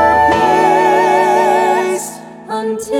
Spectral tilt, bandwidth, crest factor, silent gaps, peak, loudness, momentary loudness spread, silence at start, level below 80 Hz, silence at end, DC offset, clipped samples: -4 dB/octave; 16 kHz; 12 dB; none; 0 dBFS; -12 LUFS; 12 LU; 0 s; -44 dBFS; 0 s; under 0.1%; under 0.1%